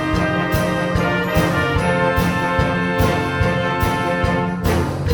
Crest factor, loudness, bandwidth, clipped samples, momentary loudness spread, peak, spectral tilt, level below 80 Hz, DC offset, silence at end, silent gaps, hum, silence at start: 14 dB; -18 LUFS; over 20 kHz; under 0.1%; 2 LU; -4 dBFS; -6 dB/octave; -30 dBFS; under 0.1%; 0 s; none; none; 0 s